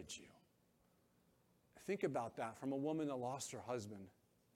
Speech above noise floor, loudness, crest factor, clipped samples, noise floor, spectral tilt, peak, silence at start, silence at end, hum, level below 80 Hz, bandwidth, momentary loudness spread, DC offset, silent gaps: 33 dB; -45 LUFS; 22 dB; under 0.1%; -77 dBFS; -5 dB/octave; -26 dBFS; 0 s; 0.45 s; none; -82 dBFS; 16.5 kHz; 13 LU; under 0.1%; none